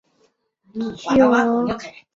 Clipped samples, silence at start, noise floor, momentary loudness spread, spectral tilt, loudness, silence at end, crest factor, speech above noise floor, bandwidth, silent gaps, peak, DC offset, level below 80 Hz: under 0.1%; 0.75 s; -64 dBFS; 15 LU; -6 dB/octave; -19 LUFS; 0.25 s; 18 dB; 45 dB; 7.6 kHz; none; -4 dBFS; under 0.1%; -54 dBFS